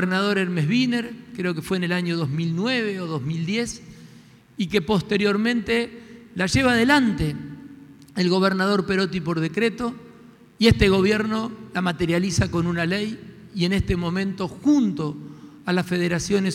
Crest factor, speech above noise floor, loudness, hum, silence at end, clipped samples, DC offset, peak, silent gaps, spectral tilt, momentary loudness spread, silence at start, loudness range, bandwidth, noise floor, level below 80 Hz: 18 dB; 27 dB; -22 LUFS; none; 0 s; under 0.1%; under 0.1%; -6 dBFS; none; -5.5 dB/octave; 14 LU; 0 s; 4 LU; 15 kHz; -49 dBFS; -42 dBFS